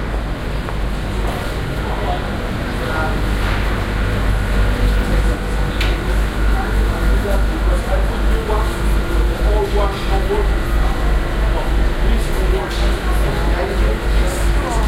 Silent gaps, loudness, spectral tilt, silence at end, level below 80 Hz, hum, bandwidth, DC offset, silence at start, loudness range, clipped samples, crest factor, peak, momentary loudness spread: none; -19 LUFS; -6 dB/octave; 0 s; -18 dBFS; none; 15 kHz; under 0.1%; 0 s; 2 LU; under 0.1%; 12 dB; -4 dBFS; 4 LU